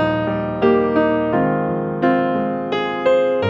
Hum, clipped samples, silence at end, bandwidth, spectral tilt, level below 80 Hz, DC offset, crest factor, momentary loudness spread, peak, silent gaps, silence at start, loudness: none; under 0.1%; 0 s; 7.4 kHz; -8 dB/octave; -46 dBFS; under 0.1%; 16 dB; 5 LU; -2 dBFS; none; 0 s; -18 LUFS